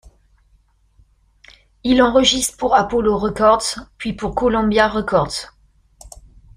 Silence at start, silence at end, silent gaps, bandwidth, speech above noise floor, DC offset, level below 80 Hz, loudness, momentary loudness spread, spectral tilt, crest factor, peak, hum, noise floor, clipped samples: 1.85 s; 0.5 s; none; 15.5 kHz; 40 dB; under 0.1%; -40 dBFS; -17 LUFS; 13 LU; -3.5 dB/octave; 18 dB; 0 dBFS; none; -57 dBFS; under 0.1%